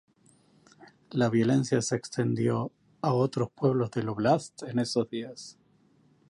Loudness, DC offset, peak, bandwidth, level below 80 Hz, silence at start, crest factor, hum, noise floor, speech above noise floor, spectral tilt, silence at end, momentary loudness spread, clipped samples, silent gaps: -28 LUFS; under 0.1%; -12 dBFS; 11.5 kHz; -66 dBFS; 0.8 s; 18 dB; none; -64 dBFS; 36 dB; -6 dB/octave; 0.8 s; 11 LU; under 0.1%; none